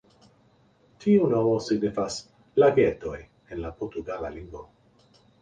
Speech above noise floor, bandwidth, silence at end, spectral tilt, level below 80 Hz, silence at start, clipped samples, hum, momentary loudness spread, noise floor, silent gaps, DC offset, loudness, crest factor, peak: 37 dB; 9.4 kHz; 0.8 s; -6.5 dB/octave; -52 dBFS; 1 s; under 0.1%; none; 20 LU; -61 dBFS; none; under 0.1%; -25 LUFS; 20 dB; -8 dBFS